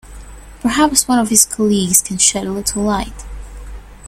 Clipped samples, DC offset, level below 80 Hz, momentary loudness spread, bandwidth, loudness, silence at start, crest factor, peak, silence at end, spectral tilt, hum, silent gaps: under 0.1%; under 0.1%; -34 dBFS; 22 LU; over 20 kHz; -14 LUFS; 0.05 s; 16 dB; 0 dBFS; 0 s; -2.5 dB/octave; none; none